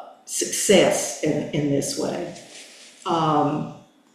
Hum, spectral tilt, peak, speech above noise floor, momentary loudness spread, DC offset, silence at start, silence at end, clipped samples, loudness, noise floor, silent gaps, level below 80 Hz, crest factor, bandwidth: none; -4 dB/octave; -4 dBFS; 23 dB; 21 LU; under 0.1%; 0 s; 0.35 s; under 0.1%; -22 LUFS; -44 dBFS; none; -60 dBFS; 20 dB; 15 kHz